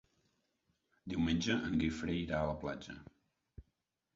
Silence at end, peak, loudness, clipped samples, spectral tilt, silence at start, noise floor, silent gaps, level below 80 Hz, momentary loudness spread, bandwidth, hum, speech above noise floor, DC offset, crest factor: 0.55 s; -20 dBFS; -37 LUFS; under 0.1%; -5 dB/octave; 1.05 s; -84 dBFS; none; -54 dBFS; 16 LU; 7.6 kHz; none; 48 dB; under 0.1%; 18 dB